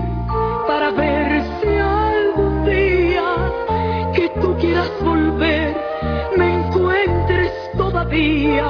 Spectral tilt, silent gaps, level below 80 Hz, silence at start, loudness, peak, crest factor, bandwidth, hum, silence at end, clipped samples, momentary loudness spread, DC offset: -8.5 dB/octave; none; -28 dBFS; 0 s; -18 LUFS; -4 dBFS; 14 dB; 5.4 kHz; none; 0 s; under 0.1%; 4 LU; under 0.1%